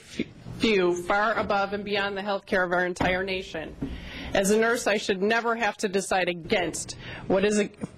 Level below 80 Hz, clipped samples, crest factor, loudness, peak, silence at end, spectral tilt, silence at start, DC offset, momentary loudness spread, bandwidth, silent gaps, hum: -48 dBFS; under 0.1%; 18 dB; -26 LUFS; -8 dBFS; 0 s; -4 dB/octave; 0 s; under 0.1%; 13 LU; 15.5 kHz; none; none